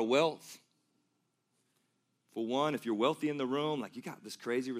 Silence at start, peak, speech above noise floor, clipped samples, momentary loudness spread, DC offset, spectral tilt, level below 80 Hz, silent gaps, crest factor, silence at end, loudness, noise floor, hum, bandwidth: 0 s; -16 dBFS; 46 dB; under 0.1%; 16 LU; under 0.1%; -5 dB/octave; under -90 dBFS; none; 20 dB; 0 s; -34 LUFS; -80 dBFS; none; 15.5 kHz